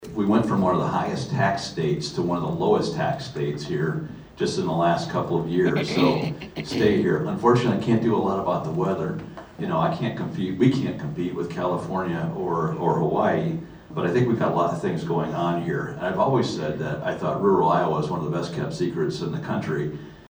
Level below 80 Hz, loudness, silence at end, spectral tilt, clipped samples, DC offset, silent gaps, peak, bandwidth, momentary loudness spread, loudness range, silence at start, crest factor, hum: -54 dBFS; -24 LUFS; 0.1 s; -7 dB/octave; under 0.1%; under 0.1%; none; -4 dBFS; over 20 kHz; 8 LU; 3 LU; 0 s; 18 dB; none